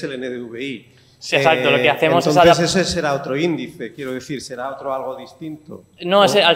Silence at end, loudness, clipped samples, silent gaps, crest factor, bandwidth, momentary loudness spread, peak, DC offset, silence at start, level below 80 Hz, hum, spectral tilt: 0 s; -17 LUFS; under 0.1%; none; 16 dB; 16 kHz; 20 LU; -2 dBFS; under 0.1%; 0 s; -52 dBFS; none; -4 dB/octave